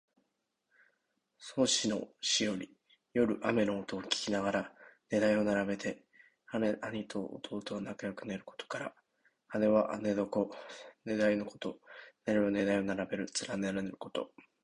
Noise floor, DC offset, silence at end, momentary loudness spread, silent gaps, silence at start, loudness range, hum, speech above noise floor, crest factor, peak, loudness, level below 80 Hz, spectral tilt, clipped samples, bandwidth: -83 dBFS; under 0.1%; 0.4 s; 13 LU; none; 1.4 s; 5 LU; none; 49 dB; 22 dB; -14 dBFS; -34 LUFS; -68 dBFS; -4 dB/octave; under 0.1%; 11 kHz